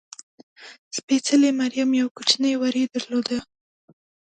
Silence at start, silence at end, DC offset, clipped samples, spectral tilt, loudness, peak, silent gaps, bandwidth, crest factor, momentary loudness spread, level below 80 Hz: 0.6 s; 0.9 s; under 0.1%; under 0.1%; -2 dB/octave; -22 LUFS; -4 dBFS; 0.79-0.91 s, 1.03-1.08 s, 2.11-2.15 s; 9.2 kHz; 20 dB; 14 LU; -68 dBFS